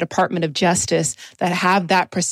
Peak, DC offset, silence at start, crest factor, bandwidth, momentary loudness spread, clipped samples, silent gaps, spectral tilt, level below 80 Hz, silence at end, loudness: -6 dBFS; under 0.1%; 0 s; 14 dB; 15 kHz; 6 LU; under 0.1%; none; -3.5 dB/octave; -56 dBFS; 0 s; -19 LUFS